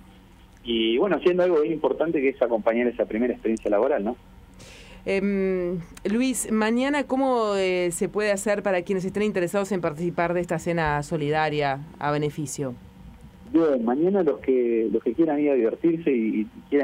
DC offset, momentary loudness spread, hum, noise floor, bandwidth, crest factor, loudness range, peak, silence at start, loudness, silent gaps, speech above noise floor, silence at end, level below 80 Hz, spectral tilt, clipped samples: under 0.1%; 7 LU; none; -50 dBFS; 16 kHz; 16 dB; 3 LU; -8 dBFS; 0.65 s; -24 LUFS; none; 27 dB; 0 s; -52 dBFS; -5.5 dB/octave; under 0.1%